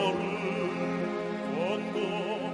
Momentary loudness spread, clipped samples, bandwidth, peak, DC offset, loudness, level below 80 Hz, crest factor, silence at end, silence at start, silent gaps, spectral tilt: 2 LU; under 0.1%; 10.5 kHz; -16 dBFS; under 0.1%; -31 LUFS; -68 dBFS; 16 dB; 0 s; 0 s; none; -6 dB/octave